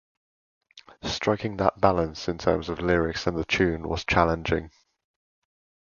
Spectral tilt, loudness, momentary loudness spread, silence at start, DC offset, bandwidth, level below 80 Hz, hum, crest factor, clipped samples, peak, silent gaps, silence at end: -5.5 dB/octave; -25 LUFS; 7 LU; 0.75 s; under 0.1%; 7.2 kHz; -42 dBFS; none; 24 dB; under 0.1%; -2 dBFS; none; 1.15 s